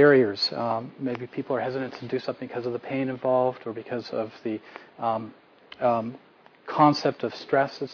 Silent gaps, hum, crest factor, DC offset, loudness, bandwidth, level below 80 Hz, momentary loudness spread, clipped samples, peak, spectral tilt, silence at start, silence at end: none; none; 22 dB; under 0.1%; -27 LUFS; 5.4 kHz; -70 dBFS; 13 LU; under 0.1%; -4 dBFS; -6.5 dB/octave; 0 s; 0 s